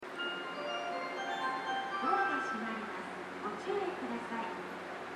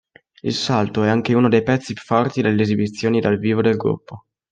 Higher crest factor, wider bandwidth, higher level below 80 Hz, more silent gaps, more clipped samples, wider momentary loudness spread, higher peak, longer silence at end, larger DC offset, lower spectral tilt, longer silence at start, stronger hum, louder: about the same, 20 dB vs 16 dB; first, 13.5 kHz vs 9.2 kHz; second, -82 dBFS vs -58 dBFS; neither; neither; about the same, 9 LU vs 7 LU; second, -18 dBFS vs -2 dBFS; second, 0 s vs 0.35 s; neither; second, -4 dB/octave vs -6.5 dB/octave; second, 0 s vs 0.45 s; neither; second, -37 LUFS vs -19 LUFS